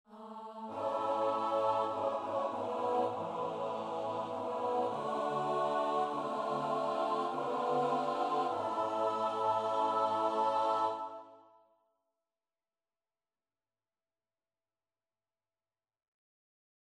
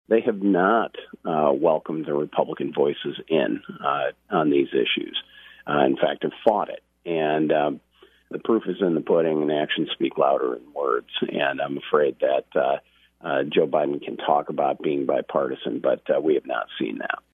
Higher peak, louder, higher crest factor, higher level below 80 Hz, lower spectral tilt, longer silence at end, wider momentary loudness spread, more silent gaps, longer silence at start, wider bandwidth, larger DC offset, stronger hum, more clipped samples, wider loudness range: second, -20 dBFS vs -4 dBFS; second, -34 LUFS vs -24 LUFS; about the same, 16 dB vs 20 dB; second, -84 dBFS vs -68 dBFS; second, -5.5 dB/octave vs -8 dB/octave; first, 5.5 s vs 0.15 s; about the same, 6 LU vs 8 LU; neither; about the same, 0.1 s vs 0.1 s; first, 12 kHz vs 3.9 kHz; neither; neither; neither; about the same, 3 LU vs 1 LU